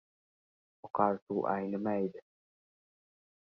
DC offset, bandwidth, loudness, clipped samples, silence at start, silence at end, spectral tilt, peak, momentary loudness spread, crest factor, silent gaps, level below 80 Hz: under 0.1%; 5.6 kHz; -34 LUFS; under 0.1%; 0.85 s; 1.3 s; -8 dB/octave; -12 dBFS; 7 LU; 24 dB; 1.22-1.27 s; -76 dBFS